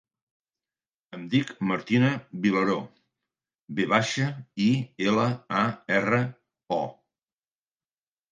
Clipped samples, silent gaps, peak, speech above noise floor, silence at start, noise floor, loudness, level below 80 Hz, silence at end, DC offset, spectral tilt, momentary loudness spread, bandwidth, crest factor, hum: under 0.1%; 3.55-3.68 s; -4 dBFS; over 65 dB; 1.1 s; under -90 dBFS; -26 LUFS; -68 dBFS; 1.4 s; under 0.1%; -6 dB/octave; 10 LU; 9.6 kHz; 24 dB; none